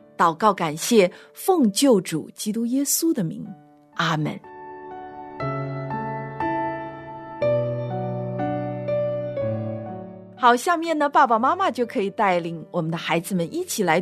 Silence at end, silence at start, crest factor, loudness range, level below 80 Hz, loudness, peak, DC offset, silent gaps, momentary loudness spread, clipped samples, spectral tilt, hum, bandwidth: 0 s; 0.2 s; 20 dB; 7 LU; -62 dBFS; -23 LUFS; -4 dBFS; under 0.1%; none; 18 LU; under 0.1%; -4.5 dB/octave; none; 14 kHz